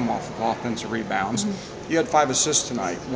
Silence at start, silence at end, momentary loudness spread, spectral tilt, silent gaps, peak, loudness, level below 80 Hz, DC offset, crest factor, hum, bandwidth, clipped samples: 0 s; 0 s; 9 LU; -3 dB/octave; none; -6 dBFS; -23 LUFS; -52 dBFS; under 0.1%; 18 dB; none; 8 kHz; under 0.1%